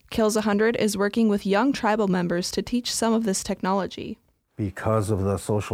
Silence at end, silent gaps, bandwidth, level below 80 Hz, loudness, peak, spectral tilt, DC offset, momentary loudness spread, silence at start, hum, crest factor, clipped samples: 0 s; none; 16 kHz; -52 dBFS; -24 LUFS; -10 dBFS; -5 dB/octave; under 0.1%; 10 LU; 0.1 s; none; 14 dB; under 0.1%